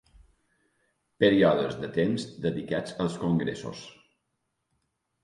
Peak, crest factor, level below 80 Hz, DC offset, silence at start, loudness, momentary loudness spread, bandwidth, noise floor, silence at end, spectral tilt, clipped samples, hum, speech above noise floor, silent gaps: -8 dBFS; 22 dB; -58 dBFS; under 0.1%; 1.2 s; -27 LUFS; 17 LU; 11.5 kHz; -79 dBFS; 1.35 s; -6.5 dB/octave; under 0.1%; none; 53 dB; none